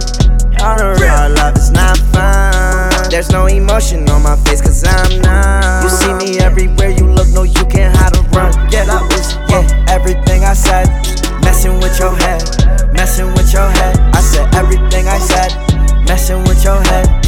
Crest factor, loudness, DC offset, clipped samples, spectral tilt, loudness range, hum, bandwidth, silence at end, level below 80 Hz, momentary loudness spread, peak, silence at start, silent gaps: 8 dB; -11 LUFS; under 0.1%; under 0.1%; -5 dB/octave; 1 LU; none; 16.5 kHz; 0 s; -10 dBFS; 3 LU; 0 dBFS; 0 s; none